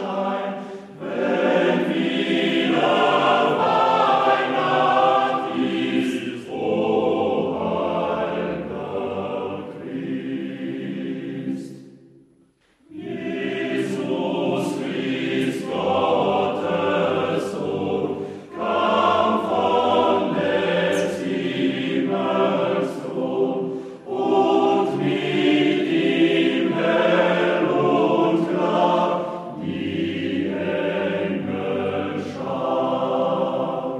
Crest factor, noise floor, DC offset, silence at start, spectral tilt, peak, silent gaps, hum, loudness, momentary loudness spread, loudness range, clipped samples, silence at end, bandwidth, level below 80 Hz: 16 dB; -59 dBFS; under 0.1%; 0 s; -6 dB/octave; -6 dBFS; none; none; -21 LUFS; 11 LU; 9 LU; under 0.1%; 0 s; 12.5 kHz; -64 dBFS